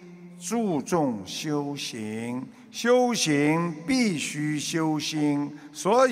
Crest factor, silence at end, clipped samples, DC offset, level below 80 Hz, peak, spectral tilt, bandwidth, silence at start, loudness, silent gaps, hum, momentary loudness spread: 18 dB; 0 s; under 0.1%; under 0.1%; -68 dBFS; -8 dBFS; -4.5 dB/octave; 16 kHz; 0 s; -26 LUFS; none; none; 11 LU